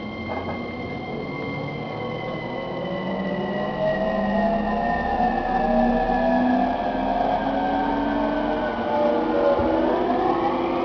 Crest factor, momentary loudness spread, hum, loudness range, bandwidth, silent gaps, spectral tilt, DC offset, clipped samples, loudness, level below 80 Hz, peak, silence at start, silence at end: 14 dB; 9 LU; none; 6 LU; 5.4 kHz; none; -8 dB/octave; under 0.1%; under 0.1%; -23 LUFS; -40 dBFS; -8 dBFS; 0 s; 0 s